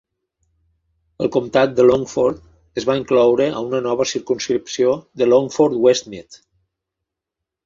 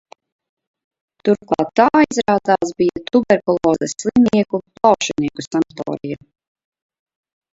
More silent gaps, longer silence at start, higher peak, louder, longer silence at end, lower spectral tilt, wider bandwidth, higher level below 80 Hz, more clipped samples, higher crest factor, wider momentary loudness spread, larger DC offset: neither; about the same, 1.2 s vs 1.25 s; about the same, -2 dBFS vs 0 dBFS; about the same, -18 LUFS vs -17 LUFS; about the same, 1.3 s vs 1.4 s; about the same, -5 dB/octave vs -5 dB/octave; about the same, 7.6 kHz vs 8 kHz; about the same, -54 dBFS vs -52 dBFS; neither; about the same, 18 dB vs 18 dB; about the same, 9 LU vs 9 LU; neither